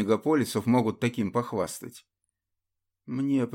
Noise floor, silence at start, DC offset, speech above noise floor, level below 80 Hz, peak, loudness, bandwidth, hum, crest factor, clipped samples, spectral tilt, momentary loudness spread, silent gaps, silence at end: -84 dBFS; 0 s; under 0.1%; 57 dB; -68 dBFS; -10 dBFS; -27 LUFS; 17 kHz; none; 18 dB; under 0.1%; -6 dB/octave; 12 LU; none; 0 s